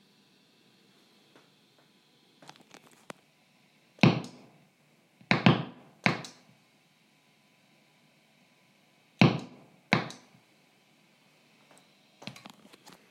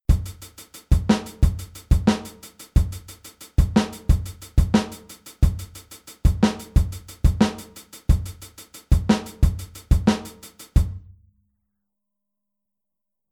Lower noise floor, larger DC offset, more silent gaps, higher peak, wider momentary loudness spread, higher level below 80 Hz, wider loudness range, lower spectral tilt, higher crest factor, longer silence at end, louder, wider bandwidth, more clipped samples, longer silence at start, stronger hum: second, -66 dBFS vs -86 dBFS; neither; neither; about the same, -4 dBFS vs -4 dBFS; first, 27 LU vs 20 LU; second, -70 dBFS vs -26 dBFS; first, 8 LU vs 3 LU; about the same, -6 dB/octave vs -6.5 dB/octave; first, 30 dB vs 18 dB; second, 0.8 s vs 2.35 s; second, -28 LUFS vs -23 LUFS; second, 12 kHz vs 17 kHz; neither; first, 4.05 s vs 0.1 s; neither